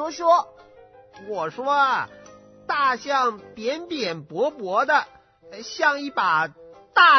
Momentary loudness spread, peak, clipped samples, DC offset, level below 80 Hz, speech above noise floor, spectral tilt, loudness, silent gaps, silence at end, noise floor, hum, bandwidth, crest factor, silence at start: 16 LU; -2 dBFS; under 0.1%; under 0.1%; -68 dBFS; 27 dB; -3 dB/octave; -23 LUFS; none; 0 s; -50 dBFS; none; 6.4 kHz; 22 dB; 0 s